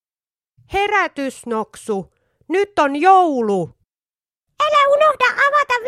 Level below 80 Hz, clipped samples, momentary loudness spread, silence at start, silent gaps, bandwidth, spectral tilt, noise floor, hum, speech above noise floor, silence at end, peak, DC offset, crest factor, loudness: -52 dBFS; under 0.1%; 13 LU; 0.7 s; none; 13.5 kHz; -4 dB/octave; under -90 dBFS; none; over 74 dB; 0 s; 0 dBFS; under 0.1%; 18 dB; -17 LUFS